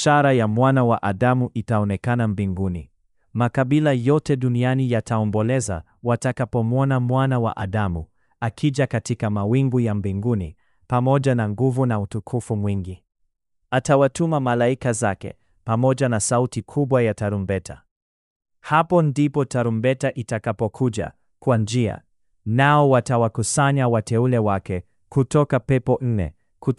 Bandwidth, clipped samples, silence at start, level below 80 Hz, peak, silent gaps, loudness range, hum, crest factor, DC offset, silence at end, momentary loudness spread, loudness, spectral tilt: 12 kHz; under 0.1%; 0 s; -48 dBFS; -4 dBFS; 17.91-18.40 s; 3 LU; none; 16 dB; under 0.1%; 0.05 s; 10 LU; -21 LUFS; -6.5 dB/octave